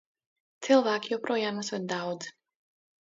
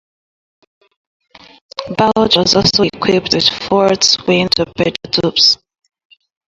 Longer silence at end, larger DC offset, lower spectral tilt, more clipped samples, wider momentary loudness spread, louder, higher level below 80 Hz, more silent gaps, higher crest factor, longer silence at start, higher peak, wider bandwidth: second, 0.75 s vs 0.95 s; neither; about the same, -4 dB/octave vs -3.5 dB/octave; neither; first, 15 LU vs 8 LU; second, -29 LUFS vs -12 LUFS; second, -80 dBFS vs -46 dBFS; neither; first, 22 dB vs 16 dB; second, 0.6 s vs 1.8 s; second, -8 dBFS vs 0 dBFS; second, 7.8 kHz vs 11.5 kHz